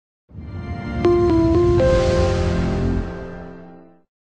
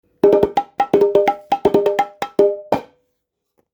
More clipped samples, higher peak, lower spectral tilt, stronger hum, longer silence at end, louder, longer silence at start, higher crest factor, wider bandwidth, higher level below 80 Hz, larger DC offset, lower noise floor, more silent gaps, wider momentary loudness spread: neither; second, -6 dBFS vs 0 dBFS; about the same, -7.5 dB/octave vs -6.5 dB/octave; neither; second, 0.55 s vs 0.9 s; about the same, -18 LUFS vs -17 LUFS; about the same, 0.35 s vs 0.25 s; about the same, 14 dB vs 16 dB; second, 9 kHz vs over 20 kHz; first, -28 dBFS vs -52 dBFS; neither; second, -43 dBFS vs -73 dBFS; neither; first, 19 LU vs 8 LU